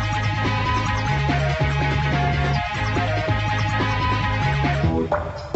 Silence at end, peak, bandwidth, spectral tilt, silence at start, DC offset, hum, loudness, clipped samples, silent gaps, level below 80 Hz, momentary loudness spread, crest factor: 0 s; -8 dBFS; 8.2 kHz; -6 dB/octave; 0 s; under 0.1%; none; -21 LUFS; under 0.1%; none; -30 dBFS; 2 LU; 14 dB